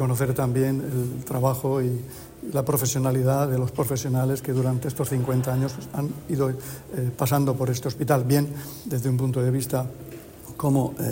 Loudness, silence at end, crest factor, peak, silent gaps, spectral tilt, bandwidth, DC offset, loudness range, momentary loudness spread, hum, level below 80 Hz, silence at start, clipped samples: -25 LUFS; 0 s; 16 dB; -8 dBFS; none; -6.5 dB/octave; 16.5 kHz; under 0.1%; 2 LU; 9 LU; none; -52 dBFS; 0 s; under 0.1%